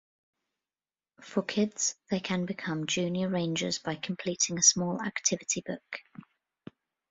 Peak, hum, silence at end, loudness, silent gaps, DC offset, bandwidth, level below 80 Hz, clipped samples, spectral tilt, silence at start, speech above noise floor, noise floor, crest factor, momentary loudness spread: -8 dBFS; none; 1.1 s; -29 LUFS; none; under 0.1%; 8 kHz; -70 dBFS; under 0.1%; -3 dB/octave; 1.2 s; over 59 dB; under -90 dBFS; 24 dB; 13 LU